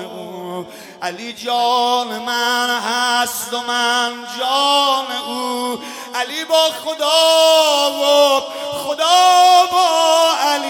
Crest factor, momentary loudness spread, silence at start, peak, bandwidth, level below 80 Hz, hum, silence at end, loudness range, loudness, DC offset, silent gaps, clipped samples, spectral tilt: 16 dB; 15 LU; 0 s; 0 dBFS; 18 kHz; -70 dBFS; none; 0 s; 6 LU; -15 LUFS; under 0.1%; none; under 0.1%; -0.5 dB/octave